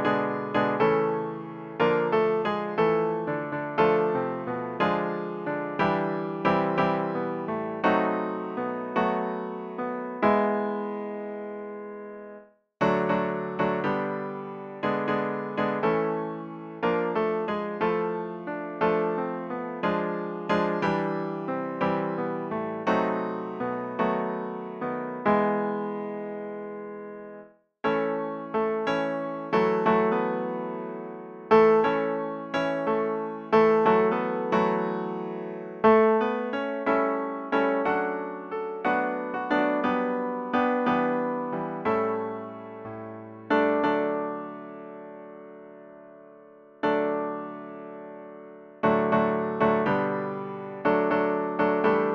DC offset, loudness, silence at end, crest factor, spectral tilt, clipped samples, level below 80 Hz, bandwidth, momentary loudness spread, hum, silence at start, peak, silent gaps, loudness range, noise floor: under 0.1%; -27 LUFS; 0 s; 18 dB; -8 dB/octave; under 0.1%; -64 dBFS; 6.6 kHz; 15 LU; none; 0 s; -8 dBFS; none; 5 LU; -51 dBFS